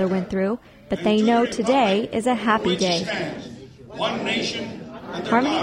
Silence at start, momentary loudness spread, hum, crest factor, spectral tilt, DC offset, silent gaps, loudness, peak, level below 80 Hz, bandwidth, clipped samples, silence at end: 0 s; 15 LU; none; 16 dB; -5 dB/octave; under 0.1%; none; -22 LUFS; -6 dBFS; -54 dBFS; 11.5 kHz; under 0.1%; 0 s